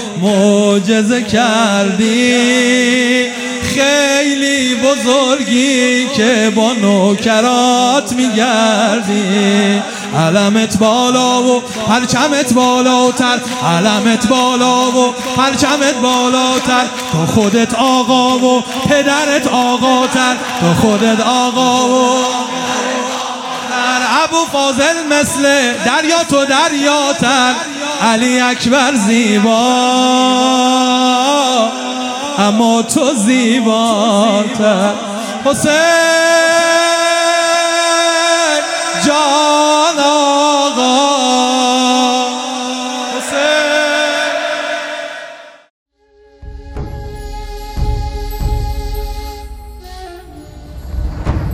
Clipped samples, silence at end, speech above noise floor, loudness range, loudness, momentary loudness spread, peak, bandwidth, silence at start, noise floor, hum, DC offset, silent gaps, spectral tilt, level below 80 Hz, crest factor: under 0.1%; 0 s; 36 dB; 7 LU; -12 LUFS; 9 LU; 0 dBFS; 16 kHz; 0 s; -47 dBFS; none; under 0.1%; 45.70-45.86 s; -3.5 dB/octave; -32 dBFS; 12 dB